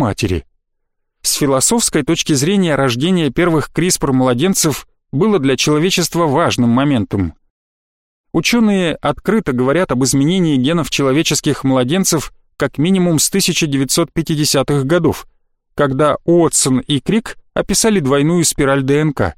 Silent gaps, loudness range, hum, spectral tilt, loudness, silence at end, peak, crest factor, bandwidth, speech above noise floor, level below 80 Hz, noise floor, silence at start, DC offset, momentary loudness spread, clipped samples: 7.50-8.24 s; 2 LU; none; -4.5 dB/octave; -14 LUFS; 0.05 s; -2 dBFS; 12 dB; 16.5 kHz; 55 dB; -38 dBFS; -69 dBFS; 0 s; 0.2%; 7 LU; under 0.1%